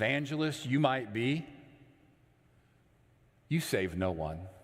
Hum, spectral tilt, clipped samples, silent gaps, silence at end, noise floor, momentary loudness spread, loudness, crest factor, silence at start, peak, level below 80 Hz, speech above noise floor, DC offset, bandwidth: none; -5.5 dB/octave; under 0.1%; none; 0.05 s; -66 dBFS; 8 LU; -33 LUFS; 22 dB; 0 s; -12 dBFS; -62 dBFS; 34 dB; under 0.1%; 16 kHz